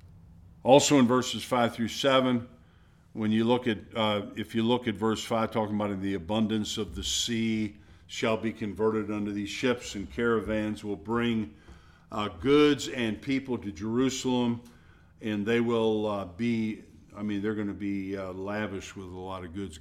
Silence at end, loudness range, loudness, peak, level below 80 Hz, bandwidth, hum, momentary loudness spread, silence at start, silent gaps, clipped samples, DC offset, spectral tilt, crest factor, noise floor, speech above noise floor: 0 s; 4 LU; -28 LUFS; -6 dBFS; -54 dBFS; 15 kHz; none; 13 LU; 0.05 s; none; under 0.1%; under 0.1%; -4.5 dB/octave; 24 dB; -58 dBFS; 30 dB